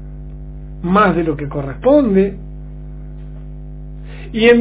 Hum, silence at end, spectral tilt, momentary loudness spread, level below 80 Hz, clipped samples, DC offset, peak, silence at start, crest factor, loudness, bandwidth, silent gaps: 50 Hz at -30 dBFS; 0 s; -10.5 dB/octave; 21 LU; -32 dBFS; under 0.1%; under 0.1%; 0 dBFS; 0 s; 16 dB; -15 LUFS; 4 kHz; none